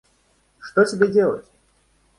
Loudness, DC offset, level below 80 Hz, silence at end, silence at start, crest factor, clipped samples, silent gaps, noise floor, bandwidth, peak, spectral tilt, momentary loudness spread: -19 LUFS; under 0.1%; -62 dBFS; 0.8 s; 0.65 s; 20 dB; under 0.1%; none; -62 dBFS; 11 kHz; -2 dBFS; -6 dB/octave; 15 LU